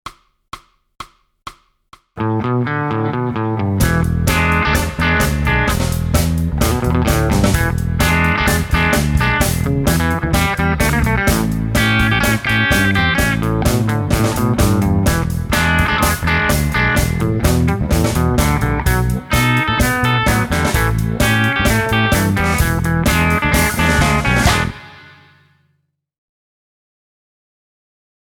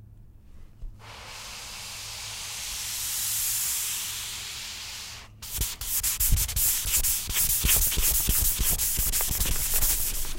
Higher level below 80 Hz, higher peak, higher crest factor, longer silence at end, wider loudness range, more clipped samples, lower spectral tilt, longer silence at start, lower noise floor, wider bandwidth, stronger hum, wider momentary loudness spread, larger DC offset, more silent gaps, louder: first, -24 dBFS vs -34 dBFS; first, -2 dBFS vs -8 dBFS; second, 14 dB vs 20 dB; first, 3.35 s vs 0 s; second, 4 LU vs 8 LU; neither; first, -5 dB/octave vs -1 dB/octave; about the same, 0.05 s vs 0 s; first, -66 dBFS vs -49 dBFS; first, over 20 kHz vs 16.5 kHz; neither; second, 5 LU vs 15 LU; neither; neither; first, -15 LUFS vs -25 LUFS